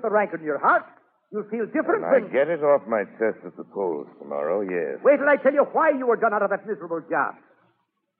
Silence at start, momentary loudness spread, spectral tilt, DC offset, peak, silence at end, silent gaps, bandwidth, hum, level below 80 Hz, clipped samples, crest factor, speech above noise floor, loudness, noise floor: 0 s; 11 LU; -5 dB/octave; under 0.1%; -6 dBFS; 0.9 s; none; 3.8 kHz; none; -90 dBFS; under 0.1%; 18 dB; 49 dB; -23 LUFS; -72 dBFS